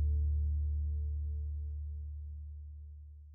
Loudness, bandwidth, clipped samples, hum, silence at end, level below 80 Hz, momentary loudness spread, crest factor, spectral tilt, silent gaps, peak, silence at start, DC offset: -38 LUFS; 0.5 kHz; under 0.1%; none; 0 s; -36 dBFS; 16 LU; 10 dB; -22.5 dB/octave; none; -26 dBFS; 0 s; under 0.1%